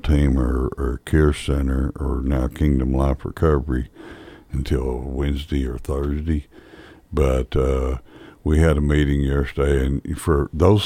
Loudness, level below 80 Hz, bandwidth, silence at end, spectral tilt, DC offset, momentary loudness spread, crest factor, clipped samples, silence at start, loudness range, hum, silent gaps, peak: -22 LUFS; -24 dBFS; 13 kHz; 0 s; -7.5 dB/octave; under 0.1%; 9 LU; 16 dB; under 0.1%; 0.05 s; 4 LU; none; none; -4 dBFS